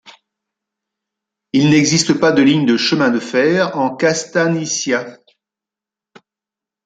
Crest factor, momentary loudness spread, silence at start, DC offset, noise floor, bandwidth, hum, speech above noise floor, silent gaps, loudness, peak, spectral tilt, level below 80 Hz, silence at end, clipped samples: 16 dB; 7 LU; 1.55 s; under 0.1%; -87 dBFS; 9.4 kHz; none; 73 dB; none; -15 LUFS; 0 dBFS; -4.5 dB/octave; -60 dBFS; 1.7 s; under 0.1%